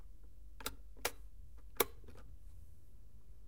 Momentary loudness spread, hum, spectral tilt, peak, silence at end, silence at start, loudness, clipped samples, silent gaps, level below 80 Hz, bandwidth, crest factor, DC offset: 25 LU; none; -2 dB/octave; -12 dBFS; 0 s; 0 s; -41 LUFS; under 0.1%; none; -58 dBFS; 16 kHz; 34 dB; 0.4%